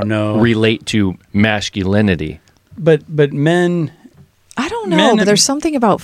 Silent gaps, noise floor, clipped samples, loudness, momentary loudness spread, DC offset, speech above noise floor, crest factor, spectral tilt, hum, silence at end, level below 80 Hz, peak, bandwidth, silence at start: none; -46 dBFS; under 0.1%; -14 LUFS; 9 LU; under 0.1%; 32 dB; 14 dB; -5 dB/octave; none; 0 s; -44 dBFS; 0 dBFS; 15 kHz; 0 s